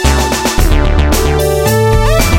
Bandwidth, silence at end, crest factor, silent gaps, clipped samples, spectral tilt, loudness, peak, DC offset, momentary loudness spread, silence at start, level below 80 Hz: 17 kHz; 0 s; 10 dB; none; under 0.1%; -5 dB/octave; -11 LUFS; 0 dBFS; under 0.1%; 2 LU; 0 s; -12 dBFS